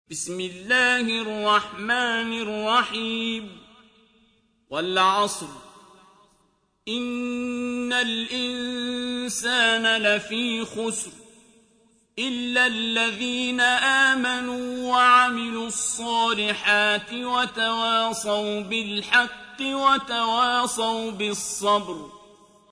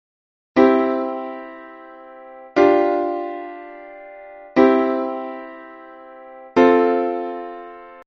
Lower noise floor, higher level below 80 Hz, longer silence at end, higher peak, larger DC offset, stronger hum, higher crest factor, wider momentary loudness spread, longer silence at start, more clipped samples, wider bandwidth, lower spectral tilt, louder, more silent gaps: first, -67 dBFS vs -40 dBFS; about the same, -64 dBFS vs -62 dBFS; first, 0.55 s vs 0.05 s; second, -6 dBFS vs -2 dBFS; neither; neither; about the same, 20 dB vs 18 dB; second, 11 LU vs 25 LU; second, 0.1 s vs 0.55 s; neither; first, 11 kHz vs 6.6 kHz; second, -1.5 dB/octave vs -3.5 dB/octave; second, -23 LUFS vs -18 LUFS; neither